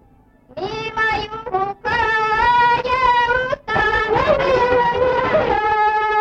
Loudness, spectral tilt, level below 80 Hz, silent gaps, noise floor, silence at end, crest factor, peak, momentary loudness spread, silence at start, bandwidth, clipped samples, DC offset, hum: -17 LUFS; -5 dB/octave; -40 dBFS; none; -51 dBFS; 0 s; 12 dB; -4 dBFS; 9 LU; 0.55 s; 8.2 kHz; under 0.1%; under 0.1%; none